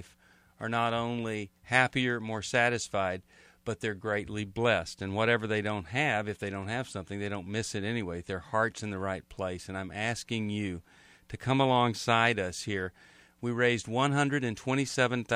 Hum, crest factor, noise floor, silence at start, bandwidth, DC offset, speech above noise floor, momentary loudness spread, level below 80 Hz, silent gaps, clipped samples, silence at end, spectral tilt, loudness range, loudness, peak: none; 24 dB; -62 dBFS; 0 s; 13.5 kHz; under 0.1%; 32 dB; 12 LU; -62 dBFS; none; under 0.1%; 0 s; -5 dB/octave; 5 LU; -31 LUFS; -8 dBFS